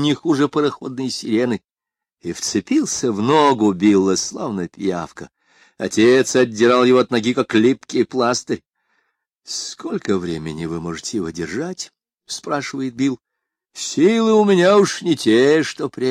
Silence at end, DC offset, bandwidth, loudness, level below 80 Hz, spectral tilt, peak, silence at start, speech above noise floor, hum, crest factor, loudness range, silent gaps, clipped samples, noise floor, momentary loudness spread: 0 s; under 0.1%; 13.5 kHz; -18 LUFS; -58 dBFS; -4.5 dB/octave; -4 dBFS; 0 s; 69 dB; none; 16 dB; 9 LU; none; under 0.1%; -86 dBFS; 14 LU